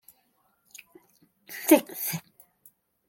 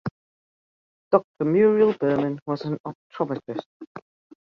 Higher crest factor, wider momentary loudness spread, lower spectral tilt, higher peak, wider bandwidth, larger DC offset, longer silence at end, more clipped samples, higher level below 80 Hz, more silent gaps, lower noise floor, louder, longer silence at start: about the same, 26 dB vs 22 dB; first, 27 LU vs 19 LU; second, -4 dB/octave vs -9.5 dB/octave; about the same, -4 dBFS vs -4 dBFS; first, 17 kHz vs 5.8 kHz; neither; first, 0.9 s vs 0.4 s; neither; second, -78 dBFS vs -66 dBFS; second, none vs 0.11-1.11 s, 1.24-1.34 s, 2.42-2.46 s, 2.80-2.84 s, 2.95-3.10 s, 3.66-3.80 s, 3.87-3.95 s; second, -70 dBFS vs under -90 dBFS; about the same, -25 LUFS vs -23 LUFS; first, 1.5 s vs 0.05 s